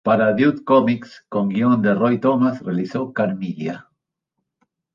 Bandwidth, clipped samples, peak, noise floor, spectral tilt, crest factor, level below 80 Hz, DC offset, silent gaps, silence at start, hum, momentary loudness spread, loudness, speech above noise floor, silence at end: 7 kHz; under 0.1%; -2 dBFS; -78 dBFS; -8.5 dB/octave; 18 dB; -62 dBFS; under 0.1%; none; 0.05 s; none; 11 LU; -19 LUFS; 60 dB; 1.15 s